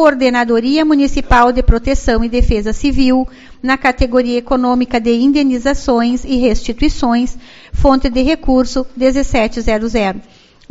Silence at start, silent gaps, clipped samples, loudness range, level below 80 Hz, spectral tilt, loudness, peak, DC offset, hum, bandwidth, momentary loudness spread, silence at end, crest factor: 0 s; none; 0.1%; 2 LU; -22 dBFS; -5.5 dB/octave; -14 LUFS; 0 dBFS; under 0.1%; none; 8 kHz; 5 LU; 0.5 s; 12 dB